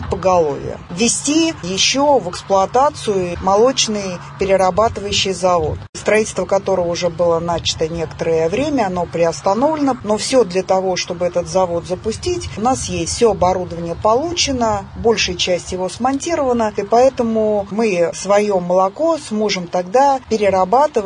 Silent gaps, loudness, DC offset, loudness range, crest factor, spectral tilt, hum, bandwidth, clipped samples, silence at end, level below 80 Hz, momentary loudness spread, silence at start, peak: 5.89-5.93 s; -16 LUFS; under 0.1%; 2 LU; 14 dB; -4 dB/octave; none; 10.5 kHz; under 0.1%; 0 s; -42 dBFS; 6 LU; 0 s; -2 dBFS